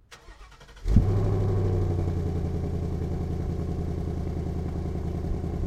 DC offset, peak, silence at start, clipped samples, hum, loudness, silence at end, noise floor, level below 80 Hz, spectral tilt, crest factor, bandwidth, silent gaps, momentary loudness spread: under 0.1%; -4 dBFS; 0.1 s; under 0.1%; none; -29 LUFS; 0 s; -48 dBFS; -32 dBFS; -9 dB/octave; 22 dB; 8.6 kHz; none; 7 LU